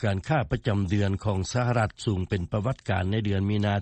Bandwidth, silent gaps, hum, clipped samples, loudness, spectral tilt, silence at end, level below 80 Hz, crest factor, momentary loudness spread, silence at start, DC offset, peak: 8.8 kHz; none; none; under 0.1%; -27 LUFS; -6.5 dB/octave; 0 s; -46 dBFS; 14 dB; 3 LU; 0 s; under 0.1%; -12 dBFS